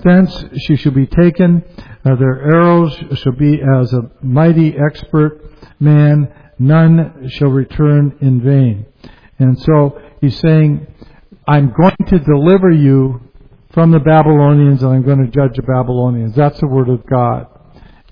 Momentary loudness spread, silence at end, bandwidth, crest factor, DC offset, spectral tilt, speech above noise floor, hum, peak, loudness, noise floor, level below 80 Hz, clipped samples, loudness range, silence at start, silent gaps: 8 LU; 0.65 s; 5.2 kHz; 10 dB; under 0.1%; -11 dB/octave; 30 dB; none; 0 dBFS; -11 LUFS; -41 dBFS; -34 dBFS; under 0.1%; 3 LU; 0 s; none